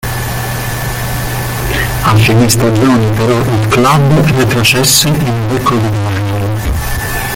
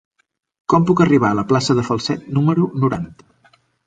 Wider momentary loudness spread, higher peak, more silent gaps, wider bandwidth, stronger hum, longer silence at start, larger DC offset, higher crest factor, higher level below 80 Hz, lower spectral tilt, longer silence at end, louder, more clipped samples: about the same, 9 LU vs 9 LU; about the same, 0 dBFS vs -2 dBFS; neither; first, 17 kHz vs 9.2 kHz; neither; second, 0.05 s vs 0.7 s; neither; second, 10 dB vs 16 dB; first, -26 dBFS vs -50 dBFS; second, -4.5 dB/octave vs -6.5 dB/octave; second, 0 s vs 0.75 s; first, -11 LUFS vs -17 LUFS; neither